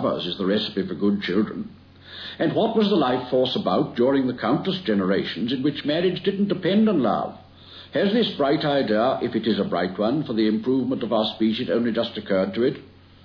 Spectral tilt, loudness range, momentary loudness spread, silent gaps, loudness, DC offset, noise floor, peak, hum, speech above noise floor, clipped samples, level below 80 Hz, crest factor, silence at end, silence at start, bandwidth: -8 dB/octave; 1 LU; 6 LU; none; -23 LUFS; under 0.1%; -45 dBFS; -8 dBFS; none; 23 dB; under 0.1%; -62 dBFS; 14 dB; 0.4 s; 0 s; 5.4 kHz